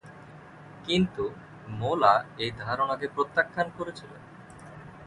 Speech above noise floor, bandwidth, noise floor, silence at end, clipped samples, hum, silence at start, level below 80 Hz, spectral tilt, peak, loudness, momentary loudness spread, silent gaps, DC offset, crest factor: 20 dB; 11 kHz; -48 dBFS; 0 s; under 0.1%; none; 0.05 s; -58 dBFS; -6 dB/octave; -6 dBFS; -28 LUFS; 25 LU; none; under 0.1%; 22 dB